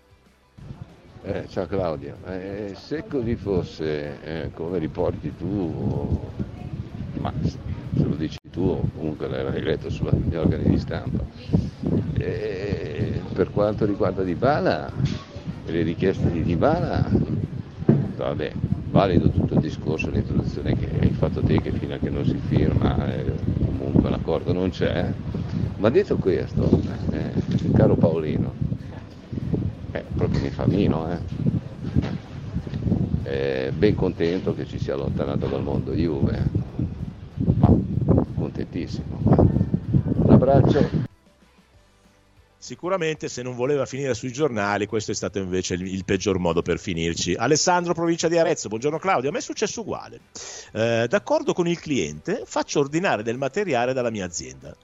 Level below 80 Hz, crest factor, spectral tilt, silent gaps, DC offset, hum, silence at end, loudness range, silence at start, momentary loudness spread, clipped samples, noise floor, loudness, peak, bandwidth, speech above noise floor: -38 dBFS; 22 dB; -6.5 dB/octave; none; under 0.1%; none; 0.1 s; 6 LU; 0.6 s; 11 LU; under 0.1%; -57 dBFS; -24 LUFS; -2 dBFS; 8 kHz; 34 dB